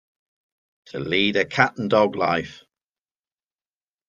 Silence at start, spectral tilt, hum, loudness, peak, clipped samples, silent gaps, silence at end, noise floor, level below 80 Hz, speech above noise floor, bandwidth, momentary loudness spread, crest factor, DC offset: 0.95 s; -5.5 dB/octave; none; -21 LUFS; -2 dBFS; under 0.1%; none; 1.55 s; under -90 dBFS; -62 dBFS; over 69 dB; 7.6 kHz; 14 LU; 22 dB; under 0.1%